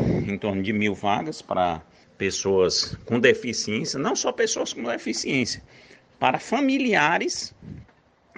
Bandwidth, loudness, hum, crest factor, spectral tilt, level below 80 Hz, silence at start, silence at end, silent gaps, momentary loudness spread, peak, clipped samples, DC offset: 10 kHz; -24 LUFS; none; 22 dB; -4 dB/octave; -52 dBFS; 0 s; 0.55 s; none; 9 LU; -4 dBFS; under 0.1%; under 0.1%